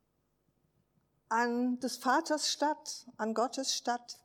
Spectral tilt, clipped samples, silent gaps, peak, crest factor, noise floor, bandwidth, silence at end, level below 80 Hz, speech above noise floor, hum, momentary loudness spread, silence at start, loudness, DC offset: -1.5 dB/octave; under 0.1%; none; -16 dBFS; 18 dB; -77 dBFS; 18 kHz; 0.1 s; -86 dBFS; 44 dB; none; 7 LU; 1.3 s; -33 LUFS; under 0.1%